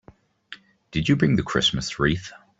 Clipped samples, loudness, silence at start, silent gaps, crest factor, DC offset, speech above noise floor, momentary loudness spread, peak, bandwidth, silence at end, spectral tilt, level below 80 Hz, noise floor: under 0.1%; -23 LUFS; 0.5 s; none; 18 dB; under 0.1%; 25 dB; 23 LU; -6 dBFS; 8 kHz; 0.25 s; -5 dB/octave; -46 dBFS; -47 dBFS